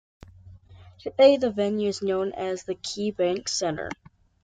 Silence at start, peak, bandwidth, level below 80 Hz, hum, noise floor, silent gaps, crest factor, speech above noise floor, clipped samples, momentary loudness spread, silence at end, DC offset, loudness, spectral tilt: 0.45 s; -6 dBFS; 9.4 kHz; -60 dBFS; none; -49 dBFS; none; 20 dB; 24 dB; under 0.1%; 16 LU; 0.5 s; under 0.1%; -25 LUFS; -4 dB/octave